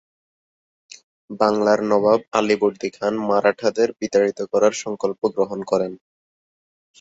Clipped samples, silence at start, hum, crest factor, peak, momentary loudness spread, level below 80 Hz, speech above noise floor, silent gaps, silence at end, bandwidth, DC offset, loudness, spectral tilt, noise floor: under 0.1%; 1.3 s; none; 20 dB; -2 dBFS; 7 LU; -64 dBFS; over 70 dB; none; 1.05 s; 8 kHz; under 0.1%; -20 LUFS; -5 dB/octave; under -90 dBFS